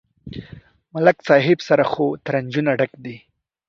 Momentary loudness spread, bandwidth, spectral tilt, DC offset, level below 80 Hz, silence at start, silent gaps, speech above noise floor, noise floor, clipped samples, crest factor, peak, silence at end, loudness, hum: 21 LU; 7.2 kHz; -7 dB/octave; under 0.1%; -56 dBFS; 0.25 s; none; 26 dB; -44 dBFS; under 0.1%; 20 dB; 0 dBFS; 0.5 s; -18 LUFS; none